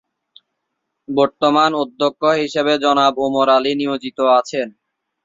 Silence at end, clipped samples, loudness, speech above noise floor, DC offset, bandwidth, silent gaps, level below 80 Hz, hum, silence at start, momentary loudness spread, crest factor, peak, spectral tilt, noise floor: 0.55 s; under 0.1%; -16 LUFS; 59 dB; under 0.1%; 7.8 kHz; none; -62 dBFS; none; 1.1 s; 8 LU; 16 dB; -2 dBFS; -4.5 dB/octave; -76 dBFS